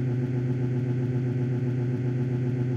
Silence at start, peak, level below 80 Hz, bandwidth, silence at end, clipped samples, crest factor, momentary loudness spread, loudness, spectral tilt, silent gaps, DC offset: 0 s; -16 dBFS; -56 dBFS; 4.7 kHz; 0 s; under 0.1%; 10 dB; 0 LU; -27 LUFS; -10 dB/octave; none; under 0.1%